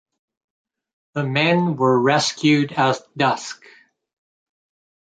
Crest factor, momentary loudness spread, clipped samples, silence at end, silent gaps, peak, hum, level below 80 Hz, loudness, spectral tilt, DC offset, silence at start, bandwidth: 18 dB; 12 LU; under 0.1%; 1.55 s; none; -4 dBFS; none; -66 dBFS; -19 LUFS; -5 dB/octave; under 0.1%; 1.15 s; 9.4 kHz